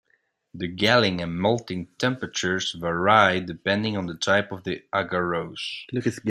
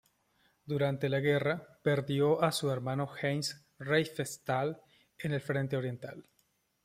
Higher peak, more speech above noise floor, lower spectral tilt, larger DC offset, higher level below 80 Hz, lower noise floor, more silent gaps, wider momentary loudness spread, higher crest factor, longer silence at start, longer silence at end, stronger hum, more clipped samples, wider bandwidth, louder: first, -2 dBFS vs -14 dBFS; about the same, 45 dB vs 43 dB; about the same, -4.5 dB/octave vs -5.5 dB/octave; neither; first, -60 dBFS vs -70 dBFS; second, -69 dBFS vs -75 dBFS; neither; about the same, 12 LU vs 11 LU; about the same, 22 dB vs 20 dB; about the same, 0.55 s vs 0.65 s; second, 0 s vs 0.65 s; neither; neither; about the same, 15 kHz vs 15.5 kHz; first, -24 LUFS vs -33 LUFS